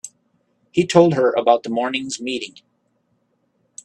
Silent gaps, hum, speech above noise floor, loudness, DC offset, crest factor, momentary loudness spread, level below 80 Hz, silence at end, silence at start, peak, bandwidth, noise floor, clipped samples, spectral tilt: none; none; 49 dB; -18 LUFS; under 0.1%; 20 dB; 14 LU; -62 dBFS; 1.35 s; 0.05 s; 0 dBFS; 10 kHz; -67 dBFS; under 0.1%; -5 dB/octave